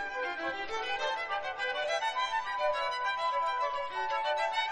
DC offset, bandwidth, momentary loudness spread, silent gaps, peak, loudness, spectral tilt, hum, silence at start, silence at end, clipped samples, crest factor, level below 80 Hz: under 0.1%; 11 kHz; 4 LU; none; -18 dBFS; -32 LUFS; -1 dB/octave; none; 0 s; 0 s; under 0.1%; 14 dB; -66 dBFS